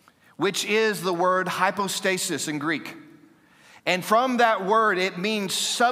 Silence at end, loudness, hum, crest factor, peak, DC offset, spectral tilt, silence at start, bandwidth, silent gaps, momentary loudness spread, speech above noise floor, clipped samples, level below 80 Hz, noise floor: 0 s; -23 LUFS; none; 18 dB; -6 dBFS; under 0.1%; -3 dB/octave; 0.4 s; 16 kHz; none; 7 LU; 31 dB; under 0.1%; -78 dBFS; -55 dBFS